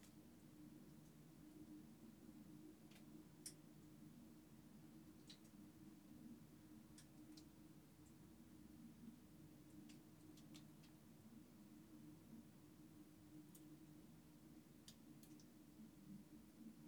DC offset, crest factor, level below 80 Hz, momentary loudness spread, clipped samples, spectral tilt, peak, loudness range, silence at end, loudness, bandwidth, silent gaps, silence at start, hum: under 0.1%; 22 dB; -82 dBFS; 4 LU; under 0.1%; -5 dB/octave; -40 dBFS; 2 LU; 0 s; -64 LUFS; over 20 kHz; none; 0 s; none